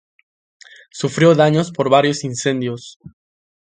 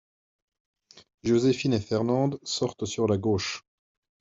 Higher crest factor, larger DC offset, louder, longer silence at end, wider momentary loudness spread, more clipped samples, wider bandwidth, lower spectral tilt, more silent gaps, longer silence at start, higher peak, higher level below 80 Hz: about the same, 18 dB vs 16 dB; neither; first, -16 LUFS vs -27 LUFS; about the same, 0.7 s vs 0.6 s; first, 18 LU vs 8 LU; neither; first, 9.6 kHz vs 8 kHz; about the same, -5.5 dB/octave vs -5.5 dB/octave; about the same, 2.96-3.00 s vs 1.14-1.18 s; about the same, 0.95 s vs 0.95 s; first, 0 dBFS vs -12 dBFS; about the same, -60 dBFS vs -64 dBFS